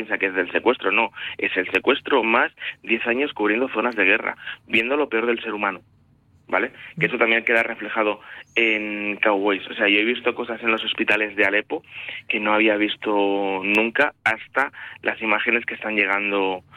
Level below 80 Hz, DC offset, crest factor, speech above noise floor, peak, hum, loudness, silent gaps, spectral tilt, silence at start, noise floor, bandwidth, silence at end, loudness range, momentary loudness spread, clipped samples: -66 dBFS; under 0.1%; 18 dB; 35 dB; -4 dBFS; none; -21 LUFS; none; -5 dB/octave; 0 s; -57 dBFS; 13.5 kHz; 0.15 s; 2 LU; 8 LU; under 0.1%